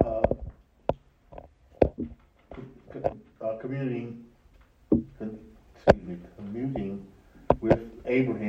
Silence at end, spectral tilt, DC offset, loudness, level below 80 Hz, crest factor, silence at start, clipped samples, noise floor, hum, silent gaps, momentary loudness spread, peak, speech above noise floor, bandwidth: 0 s; -8.5 dB/octave; under 0.1%; -29 LUFS; -44 dBFS; 28 dB; 0 s; under 0.1%; -58 dBFS; none; none; 22 LU; 0 dBFS; 31 dB; 8 kHz